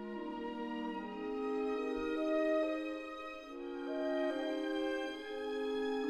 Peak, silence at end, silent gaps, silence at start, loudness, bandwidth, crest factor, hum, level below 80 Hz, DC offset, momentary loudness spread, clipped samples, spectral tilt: -24 dBFS; 0 s; none; 0 s; -38 LUFS; 11 kHz; 14 dB; none; -66 dBFS; under 0.1%; 9 LU; under 0.1%; -5 dB/octave